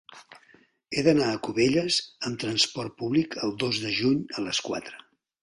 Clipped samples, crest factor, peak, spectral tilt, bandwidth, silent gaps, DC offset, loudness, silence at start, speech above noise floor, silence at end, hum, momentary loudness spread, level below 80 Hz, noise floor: under 0.1%; 20 dB; -8 dBFS; -4 dB/octave; 11.5 kHz; none; under 0.1%; -26 LUFS; 0.1 s; 33 dB; 0.45 s; none; 10 LU; -62 dBFS; -60 dBFS